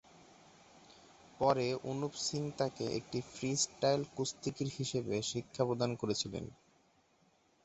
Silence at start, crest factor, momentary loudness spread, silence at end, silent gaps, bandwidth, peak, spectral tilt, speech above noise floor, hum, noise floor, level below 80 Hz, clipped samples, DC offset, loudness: 0.15 s; 22 dB; 7 LU; 1.15 s; none; 8.2 kHz; -16 dBFS; -4.5 dB/octave; 35 dB; none; -71 dBFS; -68 dBFS; under 0.1%; under 0.1%; -36 LUFS